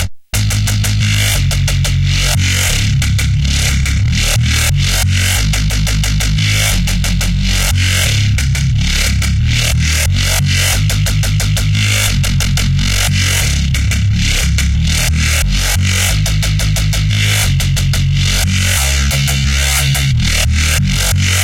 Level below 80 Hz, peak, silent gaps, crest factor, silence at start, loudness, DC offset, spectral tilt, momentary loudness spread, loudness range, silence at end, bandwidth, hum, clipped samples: -18 dBFS; 0 dBFS; none; 12 dB; 0 s; -13 LUFS; under 0.1%; -3.5 dB/octave; 2 LU; 1 LU; 0 s; 17 kHz; none; under 0.1%